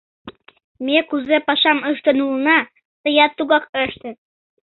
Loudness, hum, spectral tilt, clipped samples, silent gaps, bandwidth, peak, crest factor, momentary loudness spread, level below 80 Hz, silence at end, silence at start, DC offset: -17 LUFS; none; -7 dB/octave; under 0.1%; 0.64-0.75 s, 2.85-3.04 s, 3.69-3.73 s; 4.4 kHz; -2 dBFS; 18 dB; 12 LU; -60 dBFS; 0.55 s; 0.25 s; under 0.1%